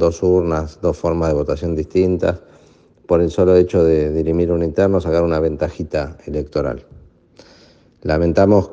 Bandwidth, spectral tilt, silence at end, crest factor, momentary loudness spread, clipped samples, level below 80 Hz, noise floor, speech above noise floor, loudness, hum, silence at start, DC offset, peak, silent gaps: 7.8 kHz; -8 dB/octave; 0 s; 16 dB; 10 LU; under 0.1%; -36 dBFS; -50 dBFS; 33 dB; -17 LUFS; none; 0 s; under 0.1%; 0 dBFS; none